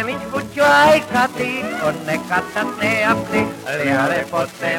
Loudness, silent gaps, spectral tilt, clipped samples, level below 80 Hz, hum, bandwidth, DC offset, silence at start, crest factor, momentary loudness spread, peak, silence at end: -18 LUFS; none; -4.5 dB/octave; under 0.1%; -52 dBFS; none; 18 kHz; under 0.1%; 0 s; 16 dB; 11 LU; -2 dBFS; 0 s